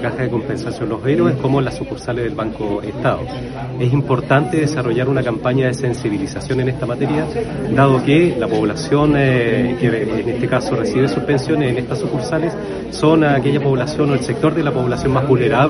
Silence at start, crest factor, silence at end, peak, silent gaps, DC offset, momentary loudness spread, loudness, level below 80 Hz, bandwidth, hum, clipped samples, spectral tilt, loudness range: 0 s; 16 dB; 0 s; 0 dBFS; none; under 0.1%; 9 LU; -17 LUFS; -40 dBFS; 11.5 kHz; none; under 0.1%; -7 dB/octave; 4 LU